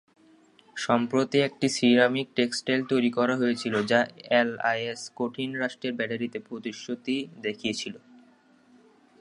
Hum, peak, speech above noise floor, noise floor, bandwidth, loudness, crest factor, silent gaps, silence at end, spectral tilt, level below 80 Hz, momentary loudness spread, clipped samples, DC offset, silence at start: none; -6 dBFS; 33 dB; -59 dBFS; 11 kHz; -27 LUFS; 22 dB; none; 1.25 s; -4.5 dB/octave; -72 dBFS; 11 LU; under 0.1%; under 0.1%; 0.75 s